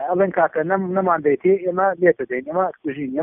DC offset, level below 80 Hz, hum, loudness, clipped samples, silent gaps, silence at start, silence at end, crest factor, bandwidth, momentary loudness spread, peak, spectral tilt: under 0.1%; -62 dBFS; none; -20 LUFS; under 0.1%; none; 0 s; 0 s; 16 dB; 3.5 kHz; 7 LU; -4 dBFS; -2 dB/octave